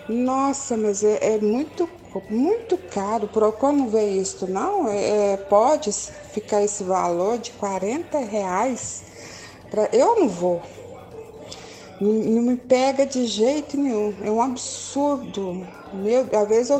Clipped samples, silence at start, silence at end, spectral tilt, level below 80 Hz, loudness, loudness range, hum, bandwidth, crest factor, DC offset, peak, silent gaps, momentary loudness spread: under 0.1%; 0 s; 0 s; -4.5 dB/octave; -58 dBFS; -22 LUFS; 3 LU; none; 9.4 kHz; 18 dB; under 0.1%; -4 dBFS; none; 16 LU